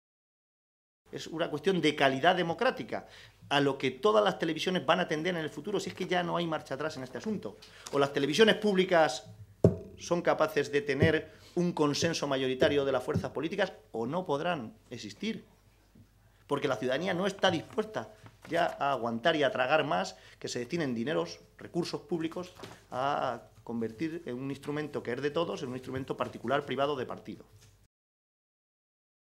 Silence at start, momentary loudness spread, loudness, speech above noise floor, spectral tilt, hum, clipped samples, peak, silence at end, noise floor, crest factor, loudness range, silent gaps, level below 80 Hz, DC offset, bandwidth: 1.1 s; 13 LU; -31 LUFS; 29 dB; -5 dB/octave; none; under 0.1%; -6 dBFS; 1.8 s; -60 dBFS; 24 dB; 7 LU; none; -64 dBFS; under 0.1%; 15 kHz